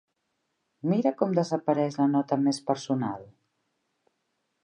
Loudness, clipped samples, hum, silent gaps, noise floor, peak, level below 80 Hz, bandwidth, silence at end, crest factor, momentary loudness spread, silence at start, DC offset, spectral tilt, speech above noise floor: -27 LUFS; under 0.1%; none; none; -78 dBFS; -8 dBFS; -76 dBFS; 10.5 kHz; 1.4 s; 20 dB; 7 LU; 0.85 s; under 0.1%; -7 dB/octave; 52 dB